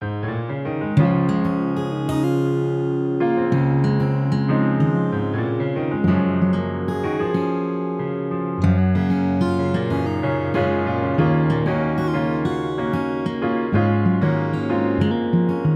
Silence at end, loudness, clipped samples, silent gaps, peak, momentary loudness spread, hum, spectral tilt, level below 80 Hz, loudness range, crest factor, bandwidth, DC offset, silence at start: 0 s; -21 LUFS; under 0.1%; none; -4 dBFS; 6 LU; none; -9 dB/octave; -46 dBFS; 2 LU; 16 dB; 10.5 kHz; under 0.1%; 0 s